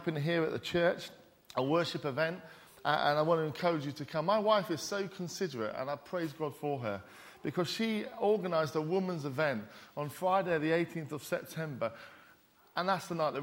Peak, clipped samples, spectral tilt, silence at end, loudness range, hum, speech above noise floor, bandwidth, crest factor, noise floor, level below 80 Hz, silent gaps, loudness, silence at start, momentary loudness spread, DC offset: -14 dBFS; under 0.1%; -5.5 dB/octave; 0 s; 3 LU; none; 30 dB; 16.5 kHz; 20 dB; -63 dBFS; -72 dBFS; none; -34 LUFS; 0 s; 11 LU; under 0.1%